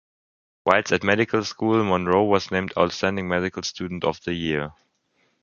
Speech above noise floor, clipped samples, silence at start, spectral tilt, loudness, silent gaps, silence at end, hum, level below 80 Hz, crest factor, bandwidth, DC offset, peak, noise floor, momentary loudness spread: 45 dB; under 0.1%; 0.65 s; -5 dB/octave; -23 LUFS; none; 0.7 s; none; -50 dBFS; 22 dB; 7.4 kHz; under 0.1%; 0 dBFS; -68 dBFS; 8 LU